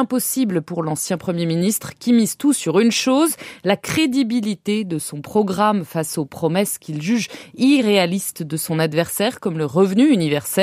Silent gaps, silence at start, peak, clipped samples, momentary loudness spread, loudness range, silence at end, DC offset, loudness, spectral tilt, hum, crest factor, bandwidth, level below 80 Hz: none; 0 s; -2 dBFS; under 0.1%; 8 LU; 2 LU; 0 s; under 0.1%; -19 LUFS; -4.5 dB/octave; none; 16 dB; 15.5 kHz; -64 dBFS